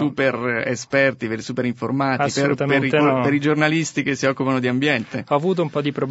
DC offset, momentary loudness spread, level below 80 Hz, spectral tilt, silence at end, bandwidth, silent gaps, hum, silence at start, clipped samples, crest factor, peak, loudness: under 0.1%; 6 LU; -62 dBFS; -5.5 dB/octave; 0 s; 8 kHz; none; none; 0 s; under 0.1%; 18 dB; -2 dBFS; -20 LUFS